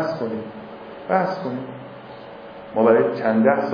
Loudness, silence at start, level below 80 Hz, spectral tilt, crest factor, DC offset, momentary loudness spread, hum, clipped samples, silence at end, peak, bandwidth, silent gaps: -21 LUFS; 0 s; -64 dBFS; -8.5 dB/octave; 18 dB; under 0.1%; 21 LU; none; under 0.1%; 0 s; -4 dBFS; 5.2 kHz; none